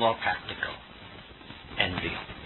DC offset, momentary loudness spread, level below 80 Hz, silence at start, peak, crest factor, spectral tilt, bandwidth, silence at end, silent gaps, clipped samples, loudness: under 0.1%; 18 LU; -52 dBFS; 0 s; -8 dBFS; 24 dB; -7.5 dB/octave; 4.3 kHz; 0 s; none; under 0.1%; -30 LUFS